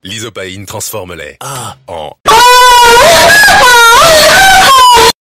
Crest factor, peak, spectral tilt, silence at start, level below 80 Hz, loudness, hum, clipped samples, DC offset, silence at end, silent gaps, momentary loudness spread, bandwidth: 6 dB; 0 dBFS; -1 dB/octave; 0.05 s; -30 dBFS; -2 LUFS; none; 2%; under 0.1%; 0.15 s; 2.20-2.24 s; 20 LU; over 20 kHz